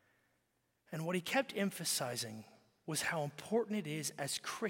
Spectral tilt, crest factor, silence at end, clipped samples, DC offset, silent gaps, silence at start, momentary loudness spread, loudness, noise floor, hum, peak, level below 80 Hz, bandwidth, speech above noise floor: -3.5 dB/octave; 20 dB; 0 s; under 0.1%; under 0.1%; none; 0.9 s; 9 LU; -38 LUFS; -81 dBFS; none; -20 dBFS; -82 dBFS; 17 kHz; 42 dB